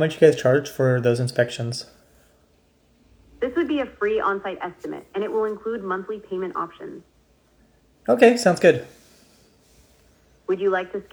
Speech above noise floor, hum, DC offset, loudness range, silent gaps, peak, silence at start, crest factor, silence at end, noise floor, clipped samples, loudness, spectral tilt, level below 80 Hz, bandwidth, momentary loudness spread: 39 dB; none; under 0.1%; 7 LU; none; -2 dBFS; 0 s; 22 dB; 0.1 s; -60 dBFS; under 0.1%; -22 LUFS; -6 dB/octave; -60 dBFS; over 20 kHz; 16 LU